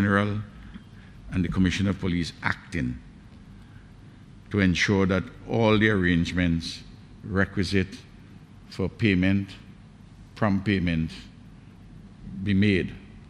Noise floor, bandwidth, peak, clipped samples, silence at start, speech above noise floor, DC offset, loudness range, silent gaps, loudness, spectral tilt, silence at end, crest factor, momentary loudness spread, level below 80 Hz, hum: -48 dBFS; 10.5 kHz; -6 dBFS; under 0.1%; 0 s; 23 dB; under 0.1%; 5 LU; none; -25 LUFS; -6.5 dB/octave; 0.05 s; 20 dB; 21 LU; -46 dBFS; none